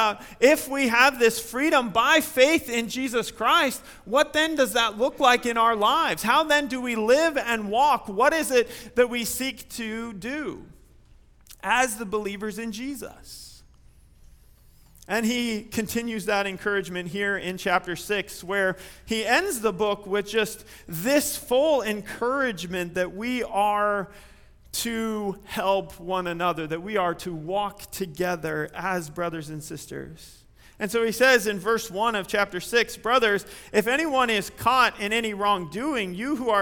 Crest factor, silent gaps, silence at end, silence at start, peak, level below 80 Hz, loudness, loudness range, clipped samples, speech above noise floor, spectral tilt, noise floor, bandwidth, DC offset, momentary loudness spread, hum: 22 dB; none; 0 s; 0 s; -2 dBFS; -54 dBFS; -24 LUFS; 8 LU; under 0.1%; 29 dB; -3 dB/octave; -53 dBFS; 19.5 kHz; under 0.1%; 12 LU; none